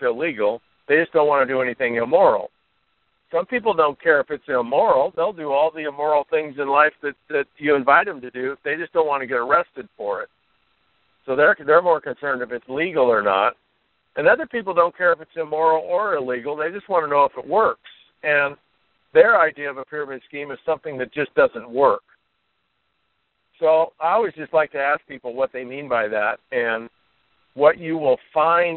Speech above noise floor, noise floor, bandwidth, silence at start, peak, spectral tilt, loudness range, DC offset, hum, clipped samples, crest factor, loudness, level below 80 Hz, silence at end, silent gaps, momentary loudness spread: 51 dB; -71 dBFS; 4.3 kHz; 0 s; 0 dBFS; -2.5 dB/octave; 3 LU; under 0.1%; none; under 0.1%; 20 dB; -20 LUFS; -64 dBFS; 0 s; none; 11 LU